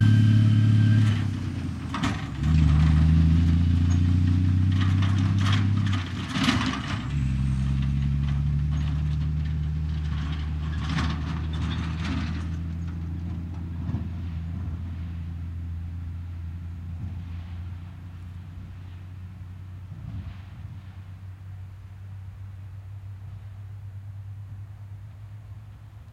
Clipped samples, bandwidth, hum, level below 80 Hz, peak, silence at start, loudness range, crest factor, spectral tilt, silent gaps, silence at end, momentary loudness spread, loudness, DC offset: under 0.1%; 10 kHz; none; -36 dBFS; -8 dBFS; 0 s; 19 LU; 18 dB; -7 dB/octave; none; 0 s; 21 LU; -26 LUFS; under 0.1%